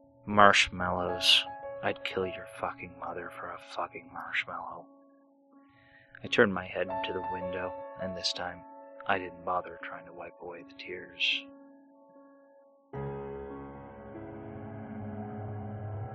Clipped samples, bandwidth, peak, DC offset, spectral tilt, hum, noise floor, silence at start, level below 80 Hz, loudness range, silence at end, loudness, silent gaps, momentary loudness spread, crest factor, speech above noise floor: under 0.1%; 8.4 kHz; -2 dBFS; under 0.1%; -3.5 dB/octave; none; -62 dBFS; 0.25 s; -62 dBFS; 12 LU; 0 s; -31 LUFS; none; 21 LU; 30 dB; 30 dB